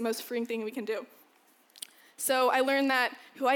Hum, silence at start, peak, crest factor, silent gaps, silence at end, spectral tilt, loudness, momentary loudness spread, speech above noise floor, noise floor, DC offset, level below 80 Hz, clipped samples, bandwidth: none; 0 s; -12 dBFS; 18 dB; none; 0 s; -2 dB/octave; -29 LUFS; 20 LU; 35 dB; -64 dBFS; under 0.1%; -88 dBFS; under 0.1%; over 20 kHz